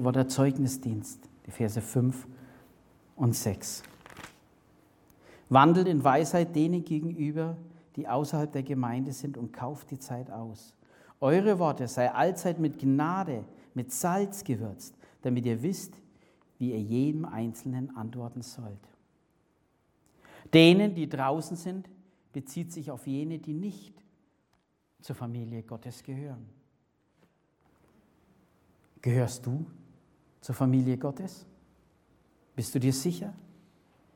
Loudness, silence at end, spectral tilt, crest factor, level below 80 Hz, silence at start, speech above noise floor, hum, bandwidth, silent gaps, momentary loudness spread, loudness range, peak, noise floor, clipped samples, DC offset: -29 LUFS; 0.75 s; -6 dB/octave; 24 dB; -70 dBFS; 0 s; 44 dB; none; 17.5 kHz; none; 19 LU; 14 LU; -6 dBFS; -72 dBFS; under 0.1%; under 0.1%